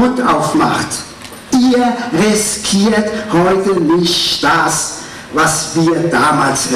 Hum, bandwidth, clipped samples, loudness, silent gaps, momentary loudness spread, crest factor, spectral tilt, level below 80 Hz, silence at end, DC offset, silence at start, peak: none; 15.5 kHz; under 0.1%; -13 LUFS; none; 8 LU; 10 dB; -3.5 dB/octave; -44 dBFS; 0 s; under 0.1%; 0 s; -4 dBFS